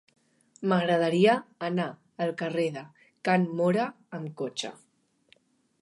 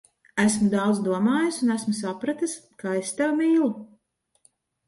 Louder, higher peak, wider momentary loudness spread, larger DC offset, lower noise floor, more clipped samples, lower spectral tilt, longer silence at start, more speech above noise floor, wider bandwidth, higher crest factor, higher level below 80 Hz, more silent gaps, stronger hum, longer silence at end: second, -28 LUFS vs -24 LUFS; about the same, -10 dBFS vs -8 dBFS; first, 13 LU vs 9 LU; neither; second, -65 dBFS vs -71 dBFS; neither; about the same, -6 dB/octave vs -5 dB/octave; first, 0.6 s vs 0.35 s; second, 38 dB vs 47 dB; about the same, 11.5 kHz vs 11.5 kHz; about the same, 20 dB vs 18 dB; second, -78 dBFS vs -64 dBFS; neither; neither; about the same, 1.1 s vs 1 s